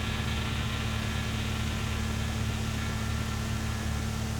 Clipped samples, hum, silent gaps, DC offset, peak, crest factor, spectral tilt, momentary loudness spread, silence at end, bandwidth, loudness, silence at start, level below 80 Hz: under 0.1%; none; none; under 0.1%; -18 dBFS; 12 dB; -4.5 dB/octave; 1 LU; 0 s; 19 kHz; -32 LUFS; 0 s; -36 dBFS